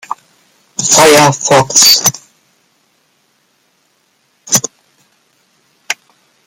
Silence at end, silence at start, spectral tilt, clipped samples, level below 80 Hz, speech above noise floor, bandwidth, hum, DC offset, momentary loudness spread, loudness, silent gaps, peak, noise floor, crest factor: 0.55 s; 0.1 s; -1.5 dB/octave; 0.2%; -54 dBFS; 50 dB; over 20 kHz; none; under 0.1%; 21 LU; -8 LUFS; none; 0 dBFS; -57 dBFS; 14 dB